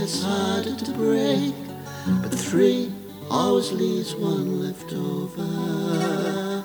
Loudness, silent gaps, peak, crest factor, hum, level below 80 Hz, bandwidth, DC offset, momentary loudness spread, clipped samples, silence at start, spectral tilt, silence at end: -24 LUFS; none; -8 dBFS; 16 dB; none; -62 dBFS; over 20 kHz; under 0.1%; 9 LU; under 0.1%; 0 s; -5.5 dB/octave; 0 s